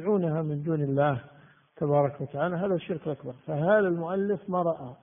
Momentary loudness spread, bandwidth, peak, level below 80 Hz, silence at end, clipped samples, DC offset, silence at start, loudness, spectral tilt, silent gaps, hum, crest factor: 9 LU; 3.7 kHz; -10 dBFS; -66 dBFS; 0.05 s; under 0.1%; under 0.1%; 0 s; -28 LUFS; -7.5 dB/octave; none; none; 16 dB